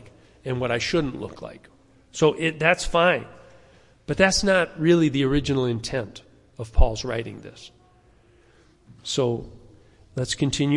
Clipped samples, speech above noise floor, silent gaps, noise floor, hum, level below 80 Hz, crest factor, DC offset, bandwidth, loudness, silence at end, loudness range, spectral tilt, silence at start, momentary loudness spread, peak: under 0.1%; 34 dB; none; -56 dBFS; none; -34 dBFS; 20 dB; under 0.1%; 11.5 kHz; -23 LUFS; 0 s; 10 LU; -5 dB/octave; 0.05 s; 19 LU; -4 dBFS